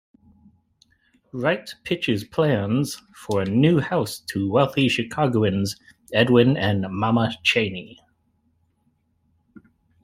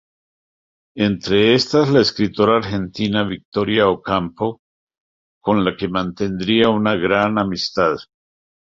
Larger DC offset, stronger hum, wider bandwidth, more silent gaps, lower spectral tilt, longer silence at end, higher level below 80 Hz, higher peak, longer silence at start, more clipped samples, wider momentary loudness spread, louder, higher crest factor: neither; neither; first, 15.5 kHz vs 7.6 kHz; second, none vs 3.45-3.52 s, 4.59-4.87 s, 4.98-5.41 s; about the same, -6 dB/octave vs -6 dB/octave; first, 2.15 s vs 0.65 s; second, -58 dBFS vs -48 dBFS; about the same, -2 dBFS vs -2 dBFS; first, 1.35 s vs 0.95 s; neither; about the same, 10 LU vs 9 LU; second, -22 LUFS vs -18 LUFS; about the same, 20 dB vs 18 dB